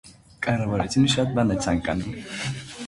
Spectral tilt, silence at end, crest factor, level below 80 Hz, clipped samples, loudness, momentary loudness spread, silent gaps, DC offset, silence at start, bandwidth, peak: -5 dB/octave; 0 s; 18 dB; -44 dBFS; under 0.1%; -24 LUFS; 10 LU; none; under 0.1%; 0.05 s; 11.5 kHz; -8 dBFS